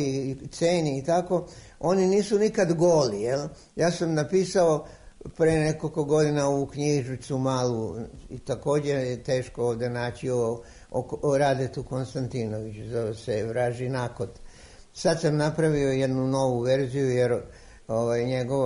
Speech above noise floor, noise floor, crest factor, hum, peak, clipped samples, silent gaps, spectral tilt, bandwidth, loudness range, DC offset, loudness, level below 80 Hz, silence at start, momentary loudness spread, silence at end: 22 dB; -47 dBFS; 14 dB; none; -12 dBFS; under 0.1%; none; -6 dB/octave; 11 kHz; 5 LU; under 0.1%; -26 LUFS; -52 dBFS; 0 s; 11 LU; 0 s